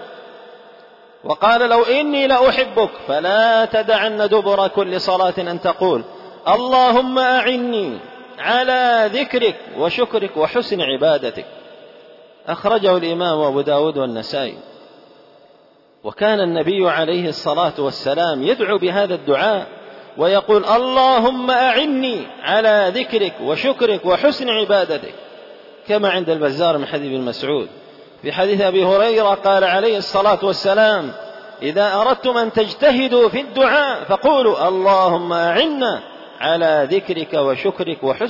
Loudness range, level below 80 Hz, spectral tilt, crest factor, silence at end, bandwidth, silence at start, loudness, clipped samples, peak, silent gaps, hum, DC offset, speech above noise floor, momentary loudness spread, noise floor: 5 LU; -56 dBFS; -5.5 dB/octave; 14 dB; 0 s; 5.8 kHz; 0 s; -16 LUFS; under 0.1%; -4 dBFS; none; none; under 0.1%; 35 dB; 10 LU; -51 dBFS